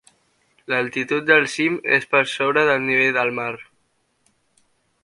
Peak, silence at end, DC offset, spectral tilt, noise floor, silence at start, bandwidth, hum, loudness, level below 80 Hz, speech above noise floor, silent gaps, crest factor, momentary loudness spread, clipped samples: 0 dBFS; 1.4 s; under 0.1%; -4.5 dB/octave; -67 dBFS; 0.7 s; 11.5 kHz; none; -19 LUFS; -68 dBFS; 47 dB; none; 22 dB; 8 LU; under 0.1%